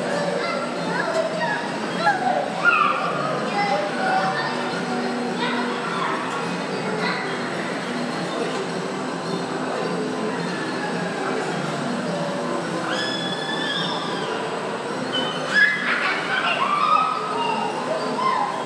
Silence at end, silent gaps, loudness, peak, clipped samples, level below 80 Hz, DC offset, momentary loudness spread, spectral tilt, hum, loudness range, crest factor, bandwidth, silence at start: 0 s; none; -23 LUFS; -6 dBFS; under 0.1%; -68 dBFS; under 0.1%; 7 LU; -4 dB/octave; none; 5 LU; 18 dB; 11 kHz; 0 s